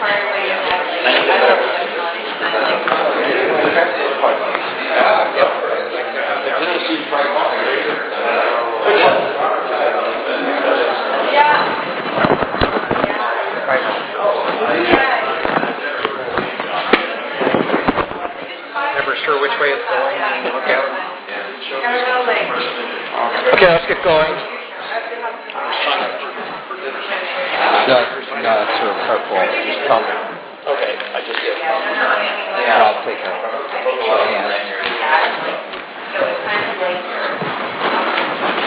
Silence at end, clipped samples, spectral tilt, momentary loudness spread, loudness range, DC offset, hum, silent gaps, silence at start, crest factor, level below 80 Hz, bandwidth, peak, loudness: 0 s; under 0.1%; -7.5 dB/octave; 9 LU; 3 LU; under 0.1%; none; none; 0 s; 16 dB; -50 dBFS; 4 kHz; 0 dBFS; -16 LUFS